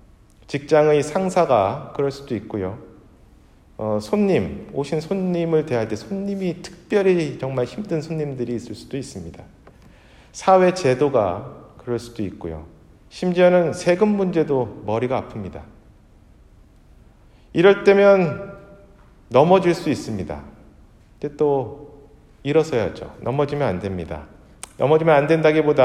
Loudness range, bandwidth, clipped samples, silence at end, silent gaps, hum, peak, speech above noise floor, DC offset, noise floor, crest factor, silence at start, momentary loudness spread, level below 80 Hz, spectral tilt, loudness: 6 LU; 12.5 kHz; under 0.1%; 0 s; none; none; 0 dBFS; 31 dB; under 0.1%; -50 dBFS; 20 dB; 0.5 s; 18 LU; -50 dBFS; -6.5 dB/octave; -20 LUFS